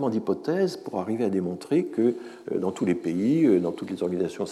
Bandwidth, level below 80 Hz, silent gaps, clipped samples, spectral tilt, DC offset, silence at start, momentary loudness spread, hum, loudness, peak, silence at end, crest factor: 12.5 kHz; -76 dBFS; none; under 0.1%; -7.5 dB/octave; under 0.1%; 0 s; 8 LU; none; -26 LUFS; -10 dBFS; 0 s; 16 dB